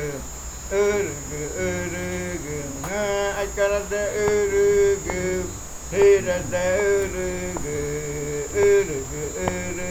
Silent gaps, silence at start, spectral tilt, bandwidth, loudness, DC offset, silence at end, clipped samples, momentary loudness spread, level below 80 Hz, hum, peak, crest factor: none; 0 s; -4.5 dB/octave; 17 kHz; -23 LUFS; under 0.1%; 0 s; under 0.1%; 11 LU; -40 dBFS; none; -4 dBFS; 18 dB